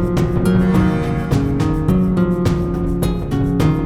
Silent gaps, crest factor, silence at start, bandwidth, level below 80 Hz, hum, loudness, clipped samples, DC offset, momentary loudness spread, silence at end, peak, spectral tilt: none; 14 dB; 0 s; 14.5 kHz; -26 dBFS; none; -17 LUFS; under 0.1%; under 0.1%; 5 LU; 0 s; -2 dBFS; -8 dB/octave